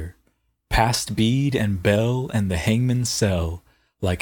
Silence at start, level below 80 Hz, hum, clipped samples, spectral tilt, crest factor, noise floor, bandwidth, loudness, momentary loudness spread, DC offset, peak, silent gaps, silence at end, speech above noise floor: 0 s; -36 dBFS; none; under 0.1%; -5.5 dB/octave; 20 dB; -67 dBFS; 18.5 kHz; -22 LUFS; 8 LU; under 0.1%; -2 dBFS; none; 0 s; 47 dB